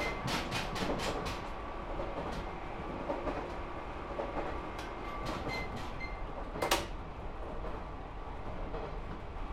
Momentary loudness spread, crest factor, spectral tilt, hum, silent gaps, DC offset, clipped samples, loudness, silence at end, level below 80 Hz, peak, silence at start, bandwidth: 10 LU; 24 dB; -4.5 dB/octave; none; none; under 0.1%; under 0.1%; -39 LUFS; 0 s; -44 dBFS; -14 dBFS; 0 s; 16 kHz